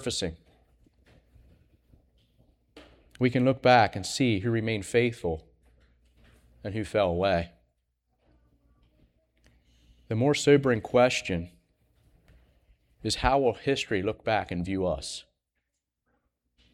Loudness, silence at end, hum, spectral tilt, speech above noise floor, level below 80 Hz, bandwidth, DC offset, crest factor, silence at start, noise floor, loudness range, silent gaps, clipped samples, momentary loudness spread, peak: -26 LUFS; 1.55 s; none; -5 dB/octave; 56 dB; -50 dBFS; 14.5 kHz; under 0.1%; 24 dB; 0 s; -82 dBFS; 7 LU; none; under 0.1%; 14 LU; -6 dBFS